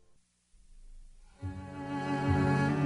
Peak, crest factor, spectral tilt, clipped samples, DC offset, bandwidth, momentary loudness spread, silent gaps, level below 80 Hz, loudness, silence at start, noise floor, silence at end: -18 dBFS; 16 dB; -7.5 dB/octave; under 0.1%; under 0.1%; 10.5 kHz; 15 LU; none; -52 dBFS; -32 LUFS; 0.7 s; -65 dBFS; 0 s